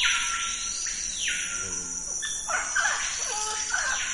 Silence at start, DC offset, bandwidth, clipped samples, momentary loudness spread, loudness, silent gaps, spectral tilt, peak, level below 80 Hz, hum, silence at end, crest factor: 0 s; under 0.1%; 11.5 kHz; under 0.1%; 5 LU; -27 LUFS; none; 1.5 dB/octave; -10 dBFS; -52 dBFS; none; 0 s; 18 dB